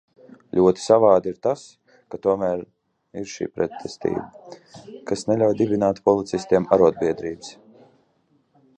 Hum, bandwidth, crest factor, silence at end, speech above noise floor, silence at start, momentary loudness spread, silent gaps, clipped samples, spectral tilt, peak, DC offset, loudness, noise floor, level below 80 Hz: none; 9.4 kHz; 20 dB; 1.25 s; 43 dB; 0.55 s; 21 LU; none; under 0.1%; -6.5 dB/octave; -2 dBFS; under 0.1%; -21 LUFS; -65 dBFS; -56 dBFS